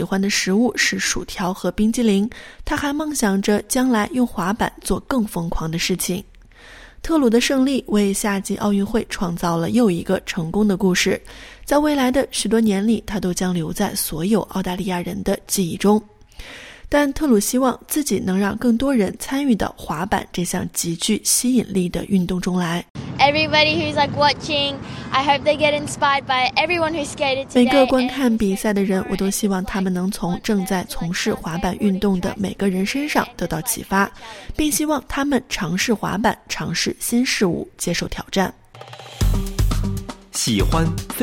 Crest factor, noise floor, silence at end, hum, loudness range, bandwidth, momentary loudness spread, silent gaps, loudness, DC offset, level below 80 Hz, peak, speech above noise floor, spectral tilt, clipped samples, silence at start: 18 dB; -43 dBFS; 0 s; none; 4 LU; 17 kHz; 8 LU; 22.90-22.95 s; -20 LUFS; under 0.1%; -36 dBFS; -2 dBFS; 24 dB; -4.5 dB/octave; under 0.1%; 0 s